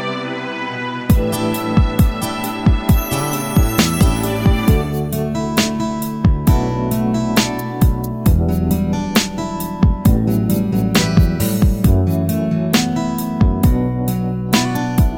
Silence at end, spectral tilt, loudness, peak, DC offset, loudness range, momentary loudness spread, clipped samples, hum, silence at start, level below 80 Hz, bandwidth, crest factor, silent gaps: 0 s; -6 dB/octave; -17 LUFS; 0 dBFS; under 0.1%; 2 LU; 6 LU; under 0.1%; none; 0 s; -22 dBFS; 18 kHz; 16 dB; none